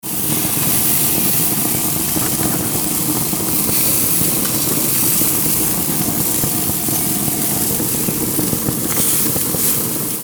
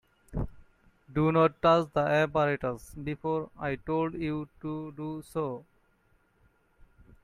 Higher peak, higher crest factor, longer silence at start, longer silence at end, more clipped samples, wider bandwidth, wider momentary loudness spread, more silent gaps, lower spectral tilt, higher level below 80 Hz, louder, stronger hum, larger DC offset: first, -2 dBFS vs -10 dBFS; second, 14 dB vs 20 dB; second, 0.05 s vs 0.3 s; second, 0 s vs 1.65 s; neither; first, over 20 kHz vs 14.5 kHz; second, 4 LU vs 14 LU; neither; second, -3 dB/octave vs -7.5 dB/octave; first, -42 dBFS vs -50 dBFS; first, -14 LUFS vs -30 LUFS; neither; neither